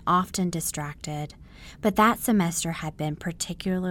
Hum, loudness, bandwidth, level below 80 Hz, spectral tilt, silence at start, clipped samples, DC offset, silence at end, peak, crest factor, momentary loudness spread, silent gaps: none; -26 LUFS; 17.5 kHz; -50 dBFS; -4.5 dB/octave; 0 s; under 0.1%; under 0.1%; 0 s; -8 dBFS; 18 dB; 13 LU; none